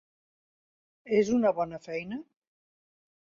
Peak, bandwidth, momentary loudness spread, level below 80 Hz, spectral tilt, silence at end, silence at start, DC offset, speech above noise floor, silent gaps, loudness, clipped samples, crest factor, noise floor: -12 dBFS; 7.4 kHz; 14 LU; -68 dBFS; -6 dB/octave; 1 s; 1.05 s; under 0.1%; over 62 dB; none; -28 LUFS; under 0.1%; 20 dB; under -90 dBFS